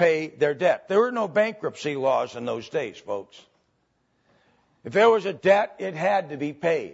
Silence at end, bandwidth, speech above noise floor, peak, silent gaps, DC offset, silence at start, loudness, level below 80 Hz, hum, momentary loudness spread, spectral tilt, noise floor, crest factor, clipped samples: 0 s; 8 kHz; 47 dB; -6 dBFS; none; under 0.1%; 0 s; -24 LUFS; -72 dBFS; none; 12 LU; -5.5 dB/octave; -70 dBFS; 18 dB; under 0.1%